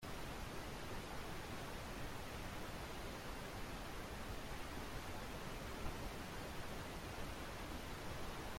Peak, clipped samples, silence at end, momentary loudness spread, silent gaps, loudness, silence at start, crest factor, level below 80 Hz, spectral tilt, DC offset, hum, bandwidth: -30 dBFS; under 0.1%; 0 s; 1 LU; none; -49 LUFS; 0 s; 16 dB; -54 dBFS; -4.5 dB/octave; under 0.1%; none; 16.5 kHz